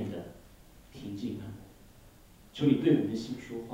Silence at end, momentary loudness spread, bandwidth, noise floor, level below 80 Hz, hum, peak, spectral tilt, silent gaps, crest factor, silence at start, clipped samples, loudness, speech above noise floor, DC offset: 0 s; 22 LU; 16 kHz; -56 dBFS; -60 dBFS; none; -12 dBFS; -7.5 dB/octave; none; 22 dB; 0 s; under 0.1%; -31 LUFS; 27 dB; under 0.1%